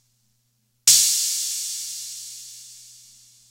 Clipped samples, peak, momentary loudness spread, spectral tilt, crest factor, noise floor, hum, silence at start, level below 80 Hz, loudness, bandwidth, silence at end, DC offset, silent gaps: under 0.1%; -2 dBFS; 25 LU; 4 dB/octave; 24 dB; -69 dBFS; 60 Hz at -70 dBFS; 0.85 s; -76 dBFS; -18 LUFS; 16 kHz; 0.6 s; under 0.1%; none